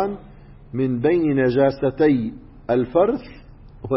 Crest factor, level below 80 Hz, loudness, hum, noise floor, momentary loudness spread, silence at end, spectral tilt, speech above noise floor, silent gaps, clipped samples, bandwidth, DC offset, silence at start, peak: 16 dB; -46 dBFS; -20 LUFS; none; -43 dBFS; 14 LU; 0 s; -12.5 dB/octave; 24 dB; none; under 0.1%; 5.8 kHz; under 0.1%; 0 s; -4 dBFS